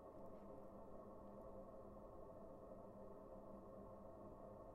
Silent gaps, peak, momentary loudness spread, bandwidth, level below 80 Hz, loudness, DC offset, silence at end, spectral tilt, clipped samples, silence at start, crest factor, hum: none; -46 dBFS; 1 LU; 12.5 kHz; -70 dBFS; -59 LUFS; under 0.1%; 0 s; -9 dB/octave; under 0.1%; 0 s; 12 dB; none